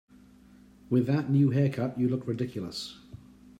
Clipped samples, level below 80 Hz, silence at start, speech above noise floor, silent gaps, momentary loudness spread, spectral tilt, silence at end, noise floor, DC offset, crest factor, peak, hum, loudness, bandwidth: under 0.1%; -64 dBFS; 0.9 s; 28 dB; none; 13 LU; -8 dB/octave; 0.45 s; -55 dBFS; under 0.1%; 16 dB; -14 dBFS; none; -28 LUFS; 10 kHz